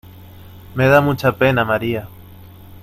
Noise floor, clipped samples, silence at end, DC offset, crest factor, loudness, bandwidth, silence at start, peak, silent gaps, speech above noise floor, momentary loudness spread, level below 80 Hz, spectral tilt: -40 dBFS; under 0.1%; 0.1 s; under 0.1%; 18 dB; -16 LUFS; 16 kHz; 0.05 s; 0 dBFS; none; 24 dB; 12 LU; -46 dBFS; -7 dB/octave